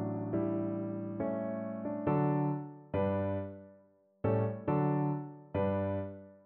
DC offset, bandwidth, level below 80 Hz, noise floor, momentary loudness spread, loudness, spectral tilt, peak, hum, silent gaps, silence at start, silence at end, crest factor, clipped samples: under 0.1%; 3.8 kHz; -64 dBFS; -65 dBFS; 8 LU; -34 LUFS; -9.5 dB/octave; -20 dBFS; none; none; 0 s; 0.1 s; 14 dB; under 0.1%